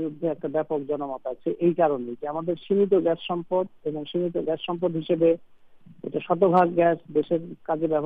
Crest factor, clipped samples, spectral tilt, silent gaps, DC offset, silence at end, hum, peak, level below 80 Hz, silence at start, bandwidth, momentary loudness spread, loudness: 18 dB; under 0.1%; -9.5 dB/octave; none; under 0.1%; 0 s; none; -6 dBFS; -66 dBFS; 0 s; 4.7 kHz; 10 LU; -25 LUFS